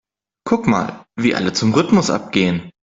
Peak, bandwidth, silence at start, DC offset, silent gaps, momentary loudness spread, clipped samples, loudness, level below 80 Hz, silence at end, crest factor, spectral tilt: 0 dBFS; 7.8 kHz; 0.45 s; under 0.1%; none; 9 LU; under 0.1%; -18 LUFS; -52 dBFS; 0.25 s; 18 dB; -5.5 dB/octave